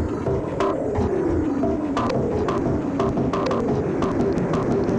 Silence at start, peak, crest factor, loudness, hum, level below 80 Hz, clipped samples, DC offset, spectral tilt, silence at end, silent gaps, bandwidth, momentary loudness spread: 0 s; -8 dBFS; 12 dB; -23 LUFS; none; -38 dBFS; under 0.1%; under 0.1%; -8 dB/octave; 0 s; none; 9.4 kHz; 2 LU